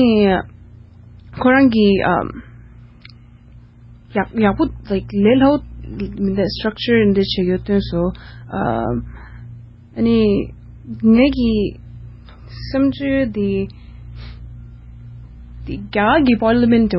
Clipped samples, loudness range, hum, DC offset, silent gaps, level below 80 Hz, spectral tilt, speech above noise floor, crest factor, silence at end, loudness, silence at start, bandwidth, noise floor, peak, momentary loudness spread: under 0.1%; 6 LU; none; under 0.1%; none; -36 dBFS; -10 dB/octave; 27 dB; 16 dB; 0 s; -17 LUFS; 0 s; 5.8 kHz; -43 dBFS; -2 dBFS; 24 LU